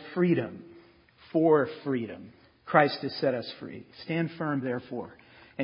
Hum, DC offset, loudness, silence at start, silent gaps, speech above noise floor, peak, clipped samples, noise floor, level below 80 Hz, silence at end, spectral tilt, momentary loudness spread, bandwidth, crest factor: none; under 0.1%; -28 LUFS; 0 s; none; 29 dB; -6 dBFS; under 0.1%; -57 dBFS; -68 dBFS; 0 s; -10.5 dB/octave; 20 LU; 5.4 kHz; 24 dB